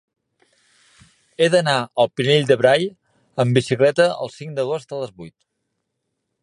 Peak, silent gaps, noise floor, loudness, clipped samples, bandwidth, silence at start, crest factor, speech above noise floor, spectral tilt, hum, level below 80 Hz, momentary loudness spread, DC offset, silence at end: -2 dBFS; none; -76 dBFS; -19 LUFS; under 0.1%; 11 kHz; 1.4 s; 20 dB; 58 dB; -5.5 dB/octave; none; -64 dBFS; 14 LU; under 0.1%; 1.15 s